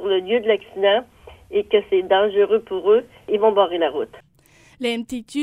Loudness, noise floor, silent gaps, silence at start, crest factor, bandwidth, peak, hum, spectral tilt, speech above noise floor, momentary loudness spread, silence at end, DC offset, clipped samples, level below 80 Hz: -20 LUFS; -53 dBFS; none; 0 s; 16 dB; 11.5 kHz; -4 dBFS; none; -4.5 dB/octave; 34 dB; 9 LU; 0 s; under 0.1%; under 0.1%; -58 dBFS